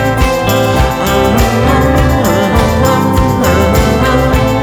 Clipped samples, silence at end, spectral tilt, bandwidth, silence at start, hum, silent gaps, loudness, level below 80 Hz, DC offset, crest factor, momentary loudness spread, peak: under 0.1%; 0 s; -6 dB/octave; over 20 kHz; 0 s; none; none; -10 LUFS; -18 dBFS; under 0.1%; 10 dB; 2 LU; 0 dBFS